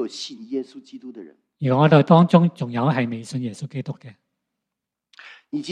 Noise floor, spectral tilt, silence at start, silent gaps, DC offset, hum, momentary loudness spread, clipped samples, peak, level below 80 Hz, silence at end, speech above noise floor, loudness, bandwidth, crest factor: -84 dBFS; -7.5 dB/octave; 0 s; none; under 0.1%; none; 24 LU; under 0.1%; 0 dBFS; -68 dBFS; 0 s; 64 dB; -20 LUFS; 9.6 kHz; 22 dB